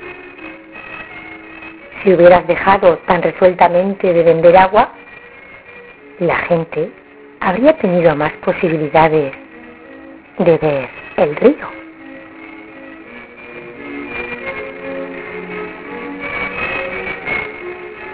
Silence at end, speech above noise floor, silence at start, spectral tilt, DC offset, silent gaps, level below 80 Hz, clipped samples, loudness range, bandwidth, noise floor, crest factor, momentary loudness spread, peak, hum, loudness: 0 s; 26 dB; 0 s; -10 dB/octave; under 0.1%; none; -46 dBFS; 0.2%; 15 LU; 4 kHz; -38 dBFS; 16 dB; 24 LU; 0 dBFS; none; -14 LUFS